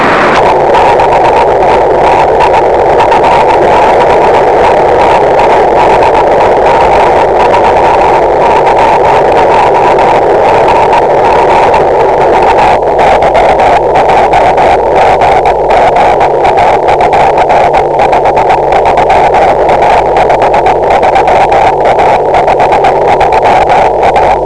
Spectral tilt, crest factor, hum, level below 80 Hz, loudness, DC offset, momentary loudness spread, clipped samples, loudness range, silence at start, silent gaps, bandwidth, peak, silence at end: -5.5 dB/octave; 6 dB; none; -26 dBFS; -5 LUFS; 3%; 1 LU; 8%; 1 LU; 0 s; none; 11 kHz; 0 dBFS; 0 s